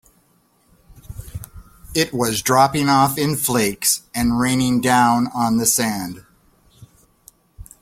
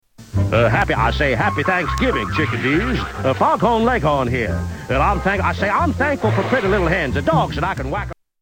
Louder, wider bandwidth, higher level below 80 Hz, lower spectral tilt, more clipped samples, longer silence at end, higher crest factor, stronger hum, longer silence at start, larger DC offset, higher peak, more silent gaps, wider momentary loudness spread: about the same, -18 LUFS vs -18 LUFS; about the same, 16.5 kHz vs 17.5 kHz; second, -44 dBFS vs -30 dBFS; second, -3.5 dB/octave vs -6.5 dB/octave; neither; about the same, 0.2 s vs 0.3 s; about the same, 18 dB vs 14 dB; neither; first, 0.95 s vs 0.2 s; neither; about the same, -2 dBFS vs -4 dBFS; neither; first, 20 LU vs 6 LU